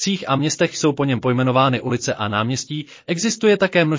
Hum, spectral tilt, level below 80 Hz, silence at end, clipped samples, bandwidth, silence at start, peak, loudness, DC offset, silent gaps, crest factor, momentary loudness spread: none; -5 dB/octave; -56 dBFS; 0 s; under 0.1%; 7.6 kHz; 0 s; -4 dBFS; -19 LUFS; under 0.1%; none; 16 dB; 8 LU